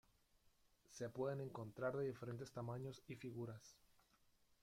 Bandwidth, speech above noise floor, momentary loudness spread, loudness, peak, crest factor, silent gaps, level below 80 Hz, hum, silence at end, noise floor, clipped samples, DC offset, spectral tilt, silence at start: 16.5 kHz; 29 dB; 9 LU; -49 LUFS; -32 dBFS; 20 dB; none; -80 dBFS; none; 0.85 s; -77 dBFS; under 0.1%; under 0.1%; -6.5 dB/octave; 0.9 s